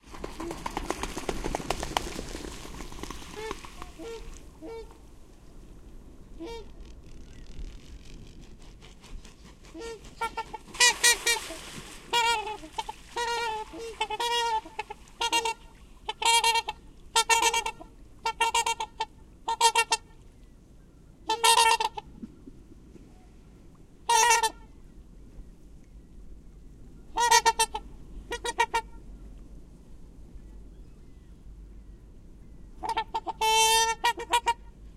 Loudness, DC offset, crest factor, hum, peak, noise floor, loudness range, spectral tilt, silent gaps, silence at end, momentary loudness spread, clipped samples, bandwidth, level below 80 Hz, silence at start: -26 LUFS; under 0.1%; 26 dB; none; -6 dBFS; -53 dBFS; 20 LU; -0.5 dB/octave; none; 0.05 s; 25 LU; under 0.1%; 16.5 kHz; -48 dBFS; 0.05 s